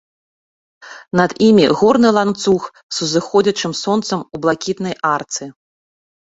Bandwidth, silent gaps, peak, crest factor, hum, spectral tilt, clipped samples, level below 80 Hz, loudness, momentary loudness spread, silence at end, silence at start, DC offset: 8 kHz; 2.83-2.89 s; -2 dBFS; 16 dB; none; -4.5 dB/octave; under 0.1%; -54 dBFS; -16 LUFS; 11 LU; 0.9 s; 0.85 s; under 0.1%